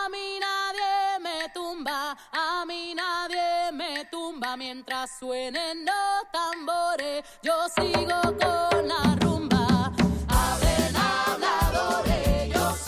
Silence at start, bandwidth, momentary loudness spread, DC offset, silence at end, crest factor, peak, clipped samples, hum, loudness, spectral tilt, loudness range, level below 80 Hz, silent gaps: 0 s; 16 kHz; 9 LU; under 0.1%; 0 s; 18 dB; -8 dBFS; under 0.1%; none; -26 LUFS; -4.5 dB/octave; 6 LU; -36 dBFS; none